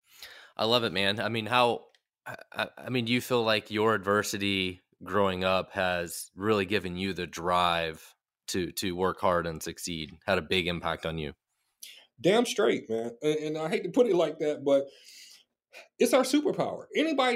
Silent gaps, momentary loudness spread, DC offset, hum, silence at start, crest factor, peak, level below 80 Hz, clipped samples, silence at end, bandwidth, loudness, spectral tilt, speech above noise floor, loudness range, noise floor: none; 16 LU; under 0.1%; none; 0.2 s; 22 dB; -8 dBFS; -60 dBFS; under 0.1%; 0 s; 16 kHz; -28 LUFS; -4.5 dB/octave; 24 dB; 3 LU; -52 dBFS